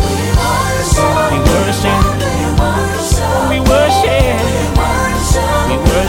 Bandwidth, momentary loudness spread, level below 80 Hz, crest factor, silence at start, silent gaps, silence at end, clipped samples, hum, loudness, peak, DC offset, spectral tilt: 17 kHz; 4 LU; -18 dBFS; 12 dB; 0 s; none; 0 s; under 0.1%; none; -13 LUFS; 0 dBFS; under 0.1%; -5 dB/octave